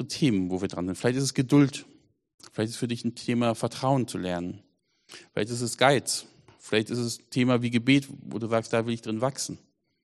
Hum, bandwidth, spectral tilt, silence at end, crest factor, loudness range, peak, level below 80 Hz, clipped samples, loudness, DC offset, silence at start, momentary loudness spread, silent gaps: none; 13 kHz; -5 dB/octave; 0.45 s; 22 dB; 4 LU; -4 dBFS; -64 dBFS; under 0.1%; -27 LUFS; under 0.1%; 0 s; 12 LU; 2.34-2.38 s